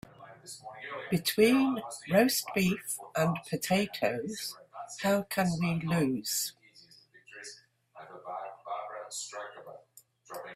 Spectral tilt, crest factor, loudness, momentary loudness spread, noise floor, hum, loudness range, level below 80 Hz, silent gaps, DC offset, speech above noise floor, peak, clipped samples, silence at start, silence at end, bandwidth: -4.5 dB/octave; 22 dB; -31 LUFS; 21 LU; -61 dBFS; none; 14 LU; -66 dBFS; none; under 0.1%; 31 dB; -12 dBFS; under 0.1%; 0.2 s; 0 s; 16 kHz